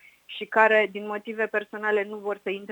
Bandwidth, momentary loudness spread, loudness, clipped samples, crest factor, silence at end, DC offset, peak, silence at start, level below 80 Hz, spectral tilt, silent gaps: 19.5 kHz; 14 LU; -25 LUFS; under 0.1%; 22 dB; 0 s; under 0.1%; -4 dBFS; 0.3 s; -80 dBFS; -5 dB/octave; none